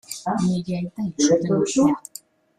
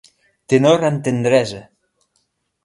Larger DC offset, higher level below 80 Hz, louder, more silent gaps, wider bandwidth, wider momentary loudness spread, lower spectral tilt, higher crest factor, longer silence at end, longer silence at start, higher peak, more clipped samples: neither; about the same, -56 dBFS vs -58 dBFS; second, -22 LUFS vs -16 LUFS; neither; first, 15 kHz vs 11.5 kHz; about the same, 10 LU vs 11 LU; about the same, -5.5 dB/octave vs -6 dB/octave; about the same, 16 dB vs 18 dB; second, 0.6 s vs 1.05 s; second, 0.1 s vs 0.5 s; second, -6 dBFS vs 0 dBFS; neither